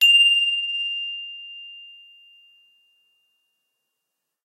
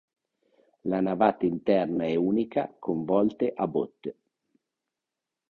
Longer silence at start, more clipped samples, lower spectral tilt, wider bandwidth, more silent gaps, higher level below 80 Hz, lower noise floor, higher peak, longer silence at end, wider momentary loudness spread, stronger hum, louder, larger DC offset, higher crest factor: second, 0 s vs 0.85 s; neither; second, 10 dB/octave vs -9.5 dB/octave; first, 16 kHz vs 4.9 kHz; neither; second, under -90 dBFS vs -64 dBFS; second, -81 dBFS vs -88 dBFS; about the same, -8 dBFS vs -8 dBFS; first, 2.6 s vs 1.4 s; first, 25 LU vs 9 LU; neither; first, -18 LUFS vs -27 LUFS; neither; about the same, 16 dB vs 20 dB